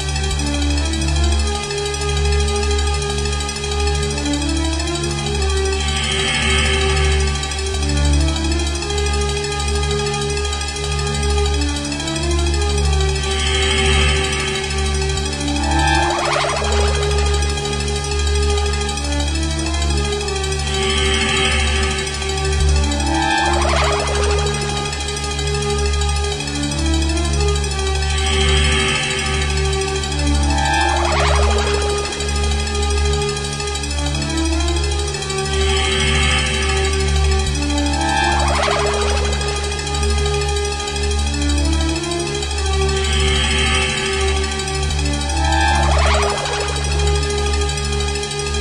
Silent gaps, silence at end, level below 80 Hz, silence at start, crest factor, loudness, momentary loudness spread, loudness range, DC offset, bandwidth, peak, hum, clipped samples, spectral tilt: none; 0 s; -22 dBFS; 0 s; 16 dB; -18 LUFS; 5 LU; 2 LU; under 0.1%; 11.5 kHz; -2 dBFS; none; under 0.1%; -4 dB/octave